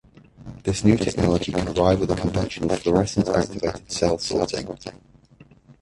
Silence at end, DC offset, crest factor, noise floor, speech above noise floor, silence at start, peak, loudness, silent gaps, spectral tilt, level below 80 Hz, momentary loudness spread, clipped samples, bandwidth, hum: 0.1 s; under 0.1%; 20 dB; -52 dBFS; 30 dB; 0.4 s; -2 dBFS; -22 LUFS; none; -6 dB/octave; -40 dBFS; 11 LU; under 0.1%; 11.5 kHz; none